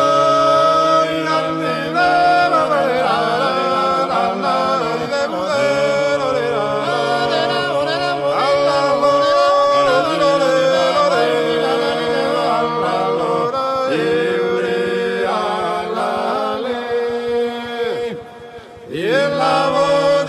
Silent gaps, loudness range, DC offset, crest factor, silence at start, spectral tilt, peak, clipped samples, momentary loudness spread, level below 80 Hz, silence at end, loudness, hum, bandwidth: none; 5 LU; under 0.1%; 14 dB; 0 s; -4.5 dB/octave; -2 dBFS; under 0.1%; 7 LU; -56 dBFS; 0 s; -16 LUFS; none; 12.5 kHz